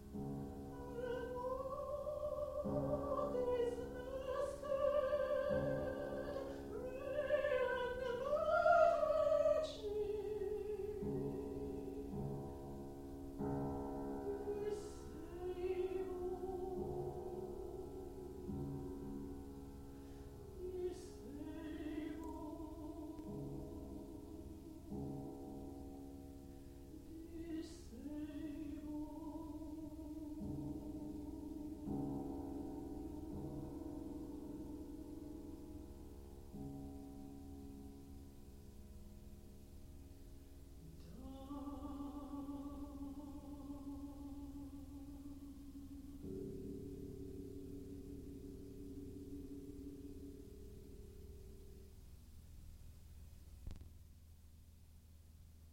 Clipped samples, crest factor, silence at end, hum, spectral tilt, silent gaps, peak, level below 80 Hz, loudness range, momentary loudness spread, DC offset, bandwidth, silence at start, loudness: under 0.1%; 24 dB; 0 s; none; -7 dB/octave; none; -20 dBFS; -58 dBFS; 18 LU; 19 LU; under 0.1%; 16.5 kHz; 0 s; -45 LUFS